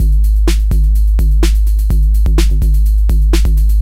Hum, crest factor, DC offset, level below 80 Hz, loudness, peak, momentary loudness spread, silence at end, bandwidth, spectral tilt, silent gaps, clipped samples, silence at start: none; 10 dB; under 0.1%; -10 dBFS; -13 LUFS; 0 dBFS; 1 LU; 0 s; 14.5 kHz; -6 dB/octave; none; under 0.1%; 0 s